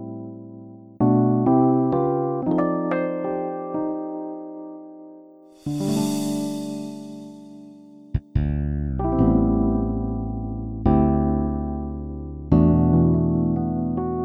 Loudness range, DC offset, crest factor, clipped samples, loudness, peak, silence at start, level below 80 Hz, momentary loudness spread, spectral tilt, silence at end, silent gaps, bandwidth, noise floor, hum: 8 LU; under 0.1%; 18 dB; under 0.1%; -22 LUFS; -4 dBFS; 0 s; -34 dBFS; 20 LU; -8.5 dB/octave; 0 s; none; 14.5 kHz; -47 dBFS; none